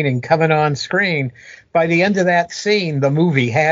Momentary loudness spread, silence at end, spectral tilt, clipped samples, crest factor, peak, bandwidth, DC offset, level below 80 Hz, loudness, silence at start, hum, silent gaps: 4 LU; 0 s; -4.5 dB/octave; under 0.1%; 16 dB; 0 dBFS; 7.6 kHz; under 0.1%; -58 dBFS; -16 LUFS; 0 s; none; none